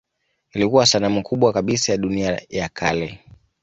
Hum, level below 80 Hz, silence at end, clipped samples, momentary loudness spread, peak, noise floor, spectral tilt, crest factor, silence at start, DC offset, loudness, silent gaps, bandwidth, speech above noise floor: none; -48 dBFS; 0.45 s; under 0.1%; 11 LU; -2 dBFS; -70 dBFS; -4 dB/octave; 18 dB; 0.55 s; under 0.1%; -19 LUFS; none; 8.2 kHz; 50 dB